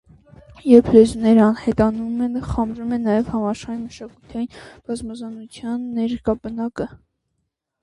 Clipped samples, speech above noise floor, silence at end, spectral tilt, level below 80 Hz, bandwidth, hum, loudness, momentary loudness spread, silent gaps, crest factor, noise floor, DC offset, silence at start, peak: under 0.1%; 56 dB; 0.85 s; -7.5 dB/octave; -42 dBFS; 11 kHz; none; -19 LUFS; 18 LU; none; 20 dB; -75 dBFS; under 0.1%; 0.5 s; 0 dBFS